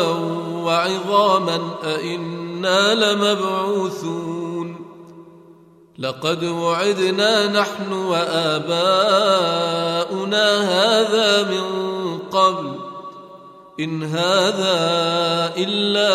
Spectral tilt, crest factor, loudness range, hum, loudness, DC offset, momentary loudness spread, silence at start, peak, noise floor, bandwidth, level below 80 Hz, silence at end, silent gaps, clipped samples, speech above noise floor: -4 dB/octave; 16 dB; 5 LU; none; -19 LUFS; under 0.1%; 12 LU; 0 s; -2 dBFS; -48 dBFS; 15 kHz; -70 dBFS; 0 s; none; under 0.1%; 29 dB